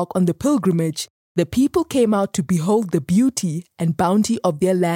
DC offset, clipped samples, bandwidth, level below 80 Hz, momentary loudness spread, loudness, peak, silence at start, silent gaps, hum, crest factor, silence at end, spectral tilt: under 0.1%; under 0.1%; 16.5 kHz; -50 dBFS; 6 LU; -20 LUFS; -4 dBFS; 0 s; 1.10-1.35 s; none; 14 dB; 0 s; -6 dB/octave